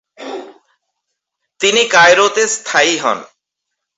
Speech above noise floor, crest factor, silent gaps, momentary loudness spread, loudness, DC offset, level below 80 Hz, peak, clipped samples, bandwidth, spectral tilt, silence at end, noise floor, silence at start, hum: 65 dB; 16 dB; none; 20 LU; -11 LUFS; under 0.1%; -62 dBFS; 0 dBFS; under 0.1%; 8.2 kHz; -1 dB/octave; 0.7 s; -77 dBFS; 0.2 s; none